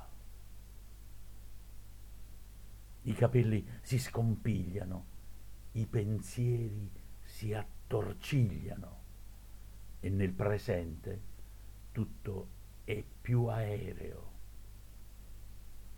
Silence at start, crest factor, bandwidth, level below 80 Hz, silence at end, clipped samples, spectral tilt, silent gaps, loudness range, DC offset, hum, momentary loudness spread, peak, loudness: 0 s; 22 dB; 18.5 kHz; -50 dBFS; 0 s; under 0.1%; -7.5 dB/octave; none; 4 LU; under 0.1%; none; 23 LU; -14 dBFS; -37 LUFS